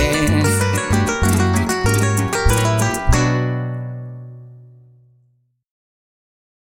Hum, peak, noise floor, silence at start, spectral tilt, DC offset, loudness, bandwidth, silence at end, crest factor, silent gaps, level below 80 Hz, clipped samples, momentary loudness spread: none; -2 dBFS; -61 dBFS; 0 s; -5 dB/octave; under 0.1%; -17 LUFS; 17 kHz; 2 s; 18 dB; none; -28 dBFS; under 0.1%; 13 LU